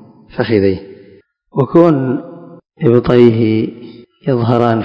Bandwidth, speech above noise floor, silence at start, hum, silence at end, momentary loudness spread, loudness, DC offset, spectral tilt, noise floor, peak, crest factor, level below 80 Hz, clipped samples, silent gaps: 5.6 kHz; 34 dB; 0.35 s; none; 0 s; 15 LU; -13 LUFS; under 0.1%; -10 dB/octave; -45 dBFS; 0 dBFS; 14 dB; -42 dBFS; 0.8%; none